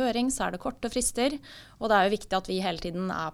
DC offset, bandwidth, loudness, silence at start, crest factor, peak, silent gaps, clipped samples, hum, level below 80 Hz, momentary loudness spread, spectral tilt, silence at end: under 0.1%; 16.5 kHz; -28 LUFS; 0 s; 18 dB; -10 dBFS; none; under 0.1%; none; -48 dBFS; 10 LU; -3.5 dB/octave; 0 s